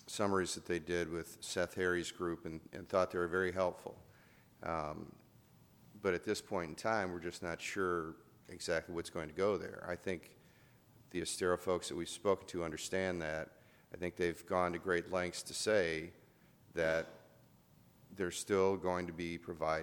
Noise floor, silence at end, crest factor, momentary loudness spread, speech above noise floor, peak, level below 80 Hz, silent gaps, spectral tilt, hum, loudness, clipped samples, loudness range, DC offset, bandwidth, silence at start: -66 dBFS; 0 s; 20 dB; 11 LU; 28 dB; -18 dBFS; -66 dBFS; none; -4 dB/octave; none; -38 LUFS; under 0.1%; 3 LU; under 0.1%; 20 kHz; 0.05 s